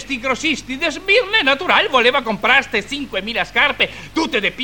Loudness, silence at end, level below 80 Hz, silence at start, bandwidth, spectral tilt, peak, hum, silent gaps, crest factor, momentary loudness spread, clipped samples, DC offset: -16 LUFS; 0 s; -46 dBFS; 0 s; 17.5 kHz; -2.5 dB/octave; 0 dBFS; 50 Hz at -45 dBFS; none; 18 dB; 8 LU; under 0.1%; 0.5%